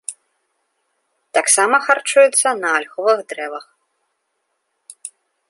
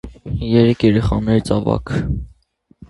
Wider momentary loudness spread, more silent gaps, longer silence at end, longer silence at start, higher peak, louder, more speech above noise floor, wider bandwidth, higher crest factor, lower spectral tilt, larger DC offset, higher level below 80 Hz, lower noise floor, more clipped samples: first, 22 LU vs 12 LU; neither; first, 0.4 s vs 0.05 s; about the same, 0.1 s vs 0.05 s; about the same, -2 dBFS vs 0 dBFS; about the same, -15 LUFS vs -17 LUFS; first, 56 dB vs 40 dB; about the same, 11.5 kHz vs 11.5 kHz; about the same, 18 dB vs 18 dB; second, 0.5 dB/octave vs -8 dB/octave; neither; second, -80 dBFS vs -32 dBFS; first, -72 dBFS vs -56 dBFS; neither